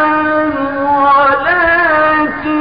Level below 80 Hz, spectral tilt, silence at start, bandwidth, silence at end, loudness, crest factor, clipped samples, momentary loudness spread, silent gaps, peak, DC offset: -40 dBFS; -10.5 dB/octave; 0 s; 5.2 kHz; 0 s; -11 LUFS; 10 dB; under 0.1%; 6 LU; none; -2 dBFS; 0.8%